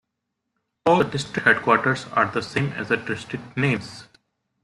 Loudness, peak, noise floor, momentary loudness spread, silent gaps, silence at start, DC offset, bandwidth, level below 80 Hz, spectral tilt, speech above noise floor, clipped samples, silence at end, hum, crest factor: -22 LUFS; -2 dBFS; -80 dBFS; 11 LU; none; 0.85 s; under 0.1%; 12 kHz; -58 dBFS; -5.5 dB/octave; 58 dB; under 0.1%; 0.6 s; none; 22 dB